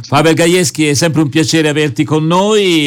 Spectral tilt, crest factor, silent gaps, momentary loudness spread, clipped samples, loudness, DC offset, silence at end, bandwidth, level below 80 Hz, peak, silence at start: -4.5 dB/octave; 10 dB; none; 4 LU; under 0.1%; -11 LUFS; under 0.1%; 0 s; 19 kHz; -48 dBFS; 0 dBFS; 0 s